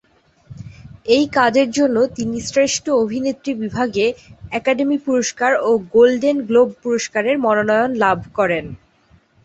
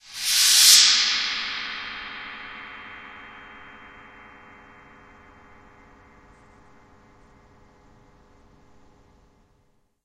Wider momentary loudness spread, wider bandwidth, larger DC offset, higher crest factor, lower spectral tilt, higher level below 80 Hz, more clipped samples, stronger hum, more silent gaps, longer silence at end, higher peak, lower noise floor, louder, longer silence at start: second, 10 LU vs 30 LU; second, 8.2 kHz vs 15.5 kHz; neither; second, 16 dB vs 26 dB; first, -4 dB/octave vs 3 dB/octave; first, -52 dBFS vs -60 dBFS; neither; neither; neither; second, 0.7 s vs 6.6 s; about the same, -2 dBFS vs 0 dBFS; second, -54 dBFS vs -66 dBFS; about the same, -17 LUFS vs -16 LUFS; first, 0.5 s vs 0.1 s